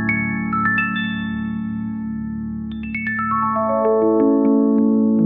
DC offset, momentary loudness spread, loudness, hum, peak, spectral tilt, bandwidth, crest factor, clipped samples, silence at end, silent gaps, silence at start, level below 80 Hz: 0.1%; 11 LU; -19 LUFS; none; -4 dBFS; -10.5 dB/octave; 3.9 kHz; 14 dB; under 0.1%; 0 s; none; 0 s; -46 dBFS